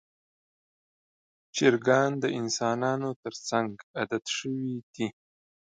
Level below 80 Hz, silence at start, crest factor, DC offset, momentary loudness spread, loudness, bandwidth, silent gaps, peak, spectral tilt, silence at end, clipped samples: -74 dBFS; 1.55 s; 22 dB; under 0.1%; 11 LU; -29 LUFS; 9.4 kHz; 3.16-3.23 s, 3.83-3.94 s, 4.83-4.93 s; -8 dBFS; -4.5 dB/octave; 0.65 s; under 0.1%